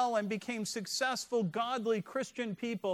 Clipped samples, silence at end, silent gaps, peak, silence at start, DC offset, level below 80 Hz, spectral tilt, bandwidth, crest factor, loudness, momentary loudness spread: under 0.1%; 0 s; none; -18 dBFS; 0 s; under 0.1%; -80 dBFS; -4 dB/octave; 15.5 kHz; 16 dB; -35 LUFS; 5 LU